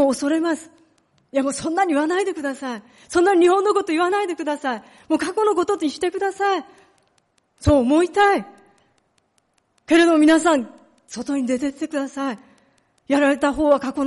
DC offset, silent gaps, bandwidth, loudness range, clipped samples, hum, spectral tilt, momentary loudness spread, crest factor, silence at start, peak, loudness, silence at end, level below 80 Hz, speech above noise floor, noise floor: under 0.1%; none; 11.5 kHz; 4 LU; under 0.1%; none; -5 dB/octave; 12 LU; 14 dB; 0 s; -6 dBFS; -20 LUFS; 0 s; -46 dBFS; 47 dB; -66 dBFS